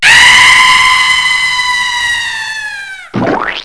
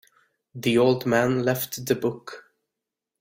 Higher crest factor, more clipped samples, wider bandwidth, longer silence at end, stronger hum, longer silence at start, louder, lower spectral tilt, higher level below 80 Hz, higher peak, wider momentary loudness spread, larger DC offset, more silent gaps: second, 8 dB vs 20 dB; first, 1% vs under 0.1%; second, 11 kHz vs 16.5 kHz; second, 0 s vs 0.8 s; neither; second, 0 s vs 0.55 s; first, -6 LUFS vs -23 LUFS; second, -0.5 dB/octave vs -5.5 dB/octave; first, -38 dBFS vs -62 dBFS; first, 0 dBFS vs -6 dBFS; about the same, 17 LU vs 19 LU; first, 0.5% vs under 0.1%; neither